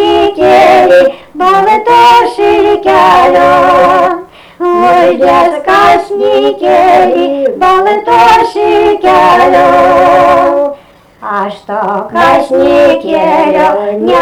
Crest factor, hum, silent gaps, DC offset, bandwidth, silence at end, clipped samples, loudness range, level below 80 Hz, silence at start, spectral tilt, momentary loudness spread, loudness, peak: 6 dB; none; none; under 0.1%; 19 kHz; 0 s; 0.7%; 3 LU; -38 dBFS; 0 s; -5 dB/octave; 8 LU; -7 LUFS; 0 dBFS